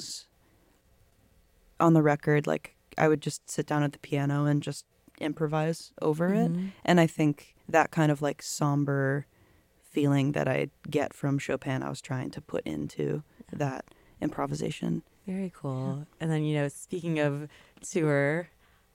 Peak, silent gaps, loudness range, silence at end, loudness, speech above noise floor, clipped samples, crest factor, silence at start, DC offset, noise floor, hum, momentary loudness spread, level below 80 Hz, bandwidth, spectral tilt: -8 dBFS; none; 7 LU; 0.5 s; -29 LUFS; 36 dB; under 0.1%; 22 dB; 0 s; under 0.1%; -64 dBFS; none; 11 LU; -64 dBFS; 16 kHz; -6.5 dB/octave